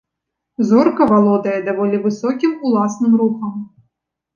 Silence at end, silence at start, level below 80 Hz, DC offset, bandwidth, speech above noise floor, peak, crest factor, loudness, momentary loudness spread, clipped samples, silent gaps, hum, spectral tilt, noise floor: 0.7 s; 0.6 s; -58 dBFS; under 0.1%; 7.4 kHz; 64 dB; -2 dBFS; 14 dB; -16 LUFS; 13 LU; under 0.1%; none; none; -7.5 dB/octave; -79 dBFS